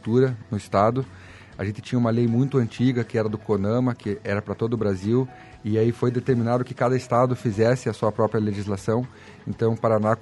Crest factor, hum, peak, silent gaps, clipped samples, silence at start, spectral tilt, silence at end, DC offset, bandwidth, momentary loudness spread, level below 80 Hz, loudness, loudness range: 18 dB; none; -4 dBFS; none; under 0.1%; 0.05 s; -8 dB/octave; 0 s; under 0.1%; 11.5 kHz; 10 LU; -56 dBFS; -24 LUFS; 2 LU